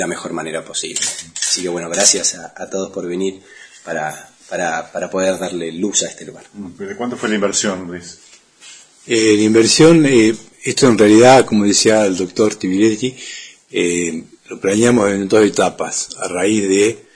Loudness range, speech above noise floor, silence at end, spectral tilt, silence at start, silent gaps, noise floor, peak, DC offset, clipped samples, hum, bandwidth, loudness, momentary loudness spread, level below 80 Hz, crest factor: 10 LU; 27 dB; 0.15 s; -3.5 dB/octave; 0 s; none; -42 dBFS; 0 dBFS; under 0.1%; under 0.1%; none; 11 kHz; -15 LUFS; 20 LU; -54 dBFS; 16 dB